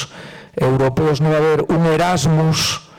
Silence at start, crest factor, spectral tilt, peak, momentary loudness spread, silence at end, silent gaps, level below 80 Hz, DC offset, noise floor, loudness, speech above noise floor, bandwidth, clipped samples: 0 s; 8 dB; -5.5 dB/octave; -10 dBFS; 10 LU; 0.2 s; none; -42 dBFS; under 0.1%; -37 dBFS; -16 LUFS; 22 dB; 16.5 kHz; under 0.1%